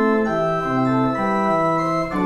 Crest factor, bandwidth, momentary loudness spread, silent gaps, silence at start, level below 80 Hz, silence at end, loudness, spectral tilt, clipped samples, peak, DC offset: 12 dB; 11 kHz; 2 LU; none; 0 s; -46 dBFS; 0 s; -20 LUFS; -7.5 dB/octave; under 0.1%; -6 dBFS; under 0.1%